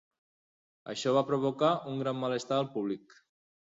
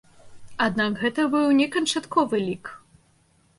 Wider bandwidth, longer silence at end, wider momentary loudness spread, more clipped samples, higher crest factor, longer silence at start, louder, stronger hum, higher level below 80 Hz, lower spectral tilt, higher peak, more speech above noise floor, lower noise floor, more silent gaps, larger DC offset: second, 8 kHz vs 11.5 kHz; about the same, 0.8 s vs 0.8 s; second, 11 LU vs 14 LU; neither; about the same, 18 dB vs 18 dB; first, 0.85 s vs 0.25 s; second, -31 LUFS vs -23 LUFS; neither; second, -74 dBFS vs -62 dBFS; first, -6 dB/octave vs -4 dB/octave; second, -14 dBFS vs -8 dBFS; first, over 59 dB vs 39 dB; first, under -90 dBFS vs -62 dBFS; neither; neither